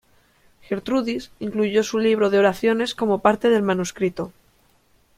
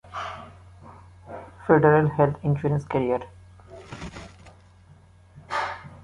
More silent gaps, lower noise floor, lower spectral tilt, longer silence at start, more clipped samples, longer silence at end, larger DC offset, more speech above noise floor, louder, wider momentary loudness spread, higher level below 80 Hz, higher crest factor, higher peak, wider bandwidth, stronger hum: neither; first, -60 dBFS vs -52 dBFS; second, -5 dB/octave vs -8 dB/octave; first, 0.7 s vs 0.1 s; neither; first, 0.9 s vs 0 s; neither; first, 39 dB vs 32 dB; about the same, -21 LUFS vs -23 LUFS; second, 11 LU vs 24 LU; about the same, -56 dBFS vs -52 dBFS; about the same, 20 dB vs 24 dB; about the same, -2 dBFS vs -2 dBFS; first, 15.5 kHz vs 10.5 kHz; neither